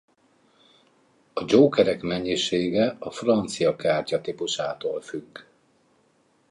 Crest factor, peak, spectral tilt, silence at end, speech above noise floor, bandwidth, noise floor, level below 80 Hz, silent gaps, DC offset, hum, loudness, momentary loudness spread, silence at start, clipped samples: 22 dB; -4 dBFS; -5 dB/octave; 1.1 s; 41 dB; 11 kHz; -64 dBFS; -60 dBFS; none; under 0.1%; none; -24 LUFS; 15 LU; 1.35 s; under 0.1%